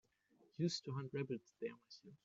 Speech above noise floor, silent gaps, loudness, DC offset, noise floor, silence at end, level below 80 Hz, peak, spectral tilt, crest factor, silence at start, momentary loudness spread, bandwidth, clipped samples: 30 dB; none; -45 LUFS; under 0.1%; -75 dBFS; 0.1 s; -86 dBFS; -28 dBFS; -6 dB/octave; 20 dB; 0.6 s; 18 LU; 7.8 kHz; under 0.1%